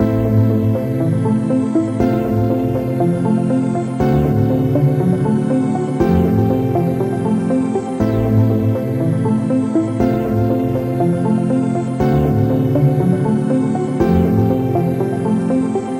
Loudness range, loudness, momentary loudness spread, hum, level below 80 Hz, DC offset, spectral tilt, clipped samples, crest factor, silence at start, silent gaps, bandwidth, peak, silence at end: 1 LU; -16 LUFS; 3 LU; none; -36 dBFS; under 0.1%; -9.5 dB/octave; under 0.1%; 12 dB; 0 s; none; 16 kHz; -2 dBFS; 0 s